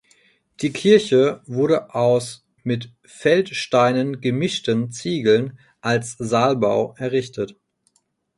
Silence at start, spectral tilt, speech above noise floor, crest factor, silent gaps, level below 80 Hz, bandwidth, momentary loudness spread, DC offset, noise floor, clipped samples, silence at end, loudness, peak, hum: 0.6 s; -5.5 dB/octave; 46 dB; 18 dB; none; -60 dBFS; 11.5 kHz; 12 LU; under 0.1%; -66 dBFS; under 0.1%; 0.85 s; -20 LUFS; -2 dBFS; none